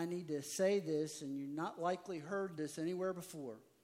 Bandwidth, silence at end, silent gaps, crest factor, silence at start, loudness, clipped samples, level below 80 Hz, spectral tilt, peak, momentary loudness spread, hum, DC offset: 16 kHz; 0.2 s; none; 18 dB; 0 s; -41 LUFS; under 0.1%; -90 dBFS; -5 dB/octave; -22 dBFS; 10 LU; none; under 0.1%